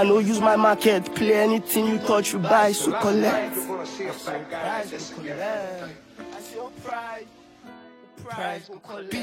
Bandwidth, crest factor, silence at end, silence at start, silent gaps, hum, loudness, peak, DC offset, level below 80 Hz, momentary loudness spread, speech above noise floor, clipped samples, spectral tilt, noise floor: 16.5 kHz; 18 dB; 0 s; 0 s; none; none; -23 LUFS; -6 dBFS; under 0.1%; -64 dBFS; 19 LU; 24 dB; under 0.1%; -4.5 dB/octave; -47 dBFS